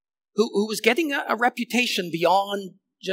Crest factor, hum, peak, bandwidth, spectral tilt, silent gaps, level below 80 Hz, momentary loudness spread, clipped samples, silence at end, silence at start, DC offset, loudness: 20 dB; none; -4 dBFS; 16 kHz; -3.5 dB/octave; none; -86 dBFS; 11 LU; under 0.1%; 0 s; 0.35 s; under 0.1%; -23 LUFS